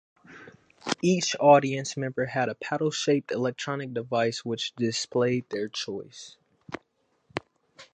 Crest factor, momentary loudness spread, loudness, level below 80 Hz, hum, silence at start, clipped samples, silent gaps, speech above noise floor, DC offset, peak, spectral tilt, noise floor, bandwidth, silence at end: 22 dB; 20 LU; -26 LUFS; -70 dBFS; none; 0.3 s; under 0.1%; none; 45 dB; under 0.1%; -6 dBFS; -4.5 dB/octave; -71 dBFS; 9.6 kHz; 0.1 s